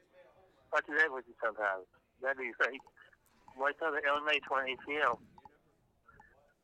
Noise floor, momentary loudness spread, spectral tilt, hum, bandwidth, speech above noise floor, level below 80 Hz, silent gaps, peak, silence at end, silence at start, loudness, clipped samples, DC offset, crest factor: -72 dBFS; 8 LU; -3 dB/octave; none; 10.5 kHz; 37 dB; -76 dBFS; none; -16 dBFS; 1.45 s; 0.2 s; -34 LUFS; under 0.1%; under 0.1%; 20 dB